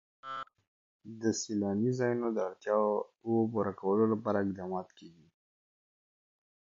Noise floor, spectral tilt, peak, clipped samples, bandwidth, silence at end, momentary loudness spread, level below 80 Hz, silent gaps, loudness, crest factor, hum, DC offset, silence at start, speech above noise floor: under -90 dBFS; -6 dB/octave; -16 dBFS; under 0.1%; 7.8 kHz; 1.55 s; 13 LU; -70 dBFS; 0.67-1.00 s; -32 LUFS; 18 dB; none; under 0.1%; 0.25 s; over 58 dB